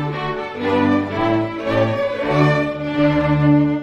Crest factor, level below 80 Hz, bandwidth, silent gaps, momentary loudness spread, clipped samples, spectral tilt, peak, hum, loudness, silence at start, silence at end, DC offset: 14 dB; -42 dBFS; 7.6 kHz; none; 7 LU; under 0.1%; -8 dB/octave; -2 dBFS; none; -18 LUFS; 0 s; 0 s; under 0.1%